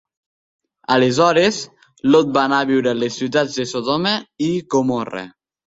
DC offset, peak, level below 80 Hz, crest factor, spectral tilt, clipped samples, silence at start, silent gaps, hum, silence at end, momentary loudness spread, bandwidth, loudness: under 0.1%; -2 dBFS; -58 dBFS; 16 dB; -4.5 dB/octave; under 0.1%; 0.9 s; none; none; 0.45 s; 14 LU; 7.8 kHz; -18 LUFS